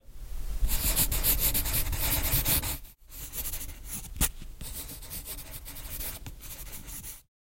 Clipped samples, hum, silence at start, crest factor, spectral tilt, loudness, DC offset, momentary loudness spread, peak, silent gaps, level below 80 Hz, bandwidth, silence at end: under 0.1%; none; 0.05 s; 20 dB; -2.5 dB/octave; -30 LUFS; under 0.1%; 18 LU; -12 dBFS; none; -36 dBFS; 16.5 kHz; 0.2 s